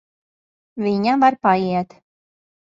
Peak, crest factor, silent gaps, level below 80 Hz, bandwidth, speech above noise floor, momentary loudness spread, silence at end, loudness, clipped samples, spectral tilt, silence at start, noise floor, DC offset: -2 dBFS; 20 dB; none; -64 dBFS; 7.6 kHz; over 72 dB; 15 LU; 0.9 s; -18 LUFS; under 0.1%; -7.5 dB/octave; 0.75 s; under -90 dBFS; under 0.1%